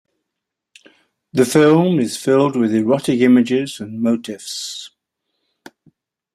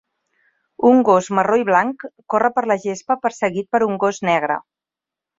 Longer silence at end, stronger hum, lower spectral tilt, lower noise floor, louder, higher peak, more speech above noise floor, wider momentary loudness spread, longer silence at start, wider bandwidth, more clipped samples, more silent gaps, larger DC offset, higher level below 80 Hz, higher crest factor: first, 1.5 s vs 0.8 s; neither; about the same, -5.5 dB/octave vs -5.5 dB/octave; second, -81 dBFS vs -87 dBFS; about the same, -16 LUFS vs -18 LUFS; about the same, -2 dBFS vs -2 dBFS; second, 65 dB vs 70 dB; first, 14 LU vs 9 LU; first, 1.35 s vs 0.8 s; first, 14.5 kHz vs 7.8 kHz; neither; neither; neither; about the same, -62 dBFS vs -64 dBFS; about the same, 16 dB vs 18 dB